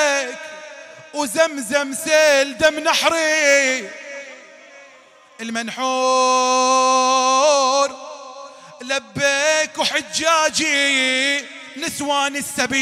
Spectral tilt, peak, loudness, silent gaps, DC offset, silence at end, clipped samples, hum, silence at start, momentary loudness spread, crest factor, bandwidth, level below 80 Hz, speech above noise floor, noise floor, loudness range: -1 dB/octave; -4 dBFS; -17 LUFS; none; under 0.1%; 0 s; under 0.1%; none; 0 s; 19 LU; 16 dB; 16 kHz; -62 dBFS; 30 dB; -48 dBFS; 3 LU